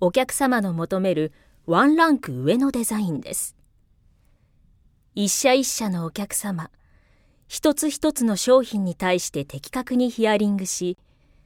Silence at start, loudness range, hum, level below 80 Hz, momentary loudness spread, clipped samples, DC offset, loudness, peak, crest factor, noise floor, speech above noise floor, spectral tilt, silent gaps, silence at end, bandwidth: 0 s; 4 LU; none; -56 dBFS; 12 LU; under 0.1%; under 0.1%; -22 LUFS; -4 dBFS; 18 dB; -59 dBFS; 37 dB; -4 dB/octave; none; 0.5 s; 17.5 kHz